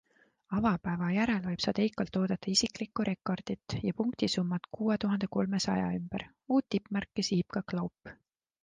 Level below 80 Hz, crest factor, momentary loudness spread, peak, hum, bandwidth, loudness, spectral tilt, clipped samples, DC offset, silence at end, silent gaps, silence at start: -60 dBFS; 18 dB; 7 LU; -14 dBFS; none; 9.6 kHz; -32 LUFS; -5 dB/octave; under 0.1%; under 0.1%; 0.5 s; none; 0.5 s